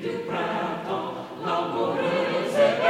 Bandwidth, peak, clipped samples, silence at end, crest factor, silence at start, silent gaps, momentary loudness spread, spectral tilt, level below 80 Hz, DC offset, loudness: 14 kHz; -6 dBFS; under 0.1%; 0 s; 18 dB; 0 s; none; 8 LU; -5.5 dB/octave; -66 dBFS; under 0.1%; -26 LUFS